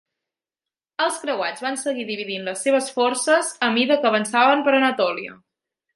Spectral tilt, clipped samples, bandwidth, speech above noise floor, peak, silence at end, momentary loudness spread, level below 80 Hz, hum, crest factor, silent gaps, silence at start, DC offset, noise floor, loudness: -2.5 dB/octave; under 0.1%; 11.5 kHz; over 69 dB; -4 dBFS; 0.6 s; 10 LU; -76 dBFS; none; 18 dB; none; 1 s; under 0.1%; under -90 dBFS; -20 LUFS